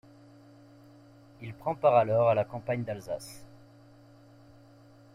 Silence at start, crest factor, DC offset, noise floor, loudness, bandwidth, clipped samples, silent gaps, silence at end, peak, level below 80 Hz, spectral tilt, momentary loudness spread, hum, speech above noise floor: 1.4 s; 20 dB; under 0.1%; -56 dBFS; -28 LUFS; 14.5 kHz; under 0.1%; none; 1.7 s; -12 dBFS; -66 dBFS; -7 dB/octave; 23 LU; none; 28 dB